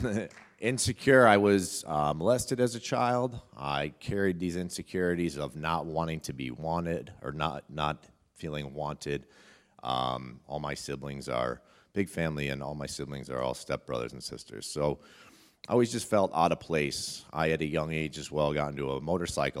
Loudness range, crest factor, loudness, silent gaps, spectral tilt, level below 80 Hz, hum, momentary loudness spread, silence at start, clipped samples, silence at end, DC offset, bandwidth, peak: 9 LU; 24 dB; -31 LUFS; none; -5 dB/octave; -54 dBFS; none; 11 LU; 0 s; under 0.1%; 0 s; under 0.1%; 16 kHz; -6 dBFS